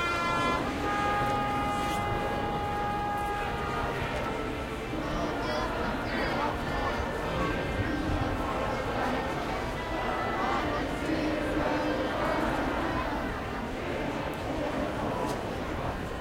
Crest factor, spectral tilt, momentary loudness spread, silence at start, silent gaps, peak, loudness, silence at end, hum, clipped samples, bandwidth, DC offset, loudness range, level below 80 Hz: 14 dB; -5.5 dB/octave; 5 LU; 0 s; none; -16 dBFS; -31 LUFS; 0 s; none; under 0.1%; 16 kHz; under 0.1%; 2 LU; -42 dBFS